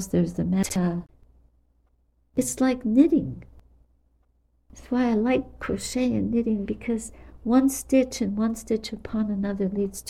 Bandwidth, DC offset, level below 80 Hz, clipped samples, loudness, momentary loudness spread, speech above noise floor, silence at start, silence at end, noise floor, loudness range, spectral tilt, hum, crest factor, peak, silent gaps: 15.5 kHz; under 0.1%; -48 dBFS; under 0.1%; -25 LUFS; 10 LU; 41 dB; 0 s; 0 s; -65 dBFS; 2 LU; -6 dB/octave; none; 18 dB; -6 dBFS; none